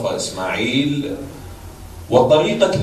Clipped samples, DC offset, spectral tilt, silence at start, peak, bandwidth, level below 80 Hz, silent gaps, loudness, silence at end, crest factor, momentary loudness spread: under 0.1%; under 0.1%; -5 dB/octave; 0 s; 0 dBFS; 14 kHz; -44 dBFS; none; -17 LUFS; 0 s; 18 dB; 23 LU